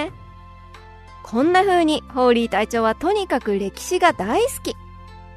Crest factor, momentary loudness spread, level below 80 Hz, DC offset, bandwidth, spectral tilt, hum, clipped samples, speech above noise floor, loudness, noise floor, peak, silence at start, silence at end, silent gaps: 18 dB; 11 LU; -44 dBFS; under 0.1%; 13.5 kHz; -4 dB/octave; none; under 0.1%; 23 dB; -19 LUFS; -42 dBFS; -2 dBFS; 0 s; 0 s; none